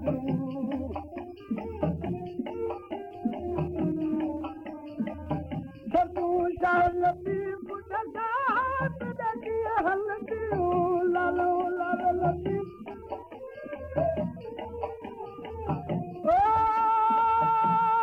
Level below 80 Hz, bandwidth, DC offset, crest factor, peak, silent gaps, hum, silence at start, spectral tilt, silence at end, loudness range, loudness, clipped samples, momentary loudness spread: -52 dBFS; 5.8 kHz; under 0.1%; 14 dB; -14 dBFS; none; none; 0 s; -9 dB/octave; 0 s; 6 LU; -29 LUFS; under 0.1%; 16 LU